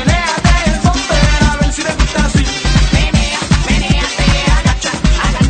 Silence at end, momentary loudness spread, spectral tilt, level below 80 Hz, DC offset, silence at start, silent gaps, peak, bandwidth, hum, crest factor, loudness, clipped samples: 0 s; 3 LU; -4.5 dB/octave; -16 dBFS; under 0.1%; 0 s; none; 0 dBFS; 9.4 kHz; none; 12 dB; -13 LUFS; under 0.1%